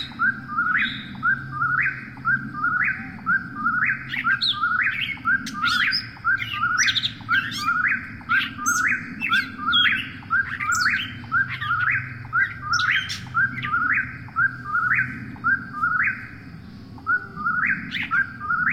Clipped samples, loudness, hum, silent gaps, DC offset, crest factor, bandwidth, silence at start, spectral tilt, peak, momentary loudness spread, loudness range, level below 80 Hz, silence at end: under 0.1%; -22 LUFS; none; none; under 0.1%; 16 dB; 16.5 kHz; 0 s; -1.5 dB/octave; -8 dBFS; 5 LU; 2 LU; -54 dBFS; 0 s